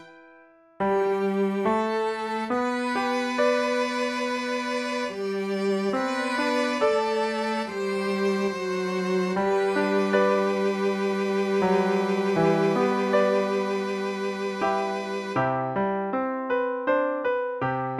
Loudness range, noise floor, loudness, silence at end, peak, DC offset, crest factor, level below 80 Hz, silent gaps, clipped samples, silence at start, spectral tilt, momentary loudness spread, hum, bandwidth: 3 LU; -54 dBFS; -25 LUFS; 0 s; -8 dBFS; under 0.1%; 16 dB; -64 dBFS; none; under 0.1%; 0 s; -5.5 dB/octave; 6 LU; none; 12.5 kHz